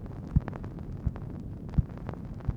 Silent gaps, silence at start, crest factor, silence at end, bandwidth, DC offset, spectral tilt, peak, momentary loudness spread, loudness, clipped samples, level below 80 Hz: none; 0 s; 22 dB; 0 s; 6 kHz; under 0.1%; -10 dB/octave; -10 dBFS; 9 LU; -35 LUFS; under 0.1%; -38 dBFS